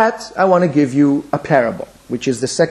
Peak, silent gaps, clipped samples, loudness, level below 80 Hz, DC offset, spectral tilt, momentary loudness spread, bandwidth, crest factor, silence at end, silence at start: 0 dBFS; none; under 0.1%; -16 LUFS; -54 dBFS; under 0.1%; -6 dB/octave; 9 LU; 11.5 kHz; 16 dB; 0 s; 0 s